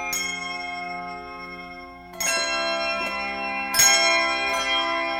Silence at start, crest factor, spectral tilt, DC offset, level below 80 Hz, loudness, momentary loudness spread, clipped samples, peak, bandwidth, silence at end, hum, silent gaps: 0 s; 20 dB; 0 dB/octave; under 0.1%; -54 dBFS; -22 LUFS; 20 LU; under 0.1%; -4 dBFS; 19 kHz; 0 s; none; none